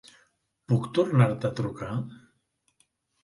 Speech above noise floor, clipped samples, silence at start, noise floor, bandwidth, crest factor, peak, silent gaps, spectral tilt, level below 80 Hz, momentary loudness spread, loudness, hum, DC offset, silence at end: 48 dB; under 0.1%; 0.7 s; -73 dBFS; 11.5 kHz; 22 dB; -8 dBFS; none; -8 dB/octave; -60 dBFS; 11 LU; -27 LUFS; none; under 0.1%; 1.1 s